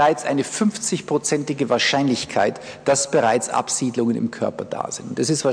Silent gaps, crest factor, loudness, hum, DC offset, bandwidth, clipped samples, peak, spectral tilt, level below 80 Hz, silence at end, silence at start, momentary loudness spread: none; 14 dB; -21 LUFS; none; under 0.1%; 11 kHz; under 0.1%; -6 dBFS; -3.5 dB/octave; -62 dBFS; 0 s; 0 s; 8 LU